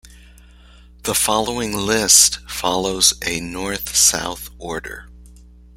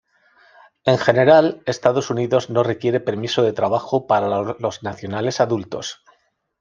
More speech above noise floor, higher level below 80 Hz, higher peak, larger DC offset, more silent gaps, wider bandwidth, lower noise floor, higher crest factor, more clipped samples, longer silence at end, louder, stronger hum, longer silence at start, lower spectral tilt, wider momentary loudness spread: second, 26 dB vs 43 dB; first, -42 dBFS vs -60 dBFS; about the same, 0 dBFS vs 0 dBFS; neither; neither; first, 16.5 kHz vs 7.4 kHz; second, -45 dBFS vs -62 dBFS; about the same, 20 dB vs 20 dB; neither; second, 0.35 s vs 0.7 s; first, -16 LUFS vs -19 LUFS; first, 60 Hz at -40 dBFS vs none; second, 0.05 s vs 0.85 s; second, -1 dB/octave vs -5.5 dB/octave; first, 18 LU vs 11 LU